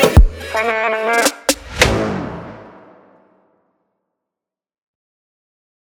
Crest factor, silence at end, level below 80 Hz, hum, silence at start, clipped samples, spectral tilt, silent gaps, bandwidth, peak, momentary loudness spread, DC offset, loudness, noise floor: 18 dB; 3.2 s; -24 dBFS; none; 0 s; 0.3%; -4 dB/octave; none; 18 kHz; 0 dBFS; 16 LU; under 0.1%; -16 LUFS; -87 dBFS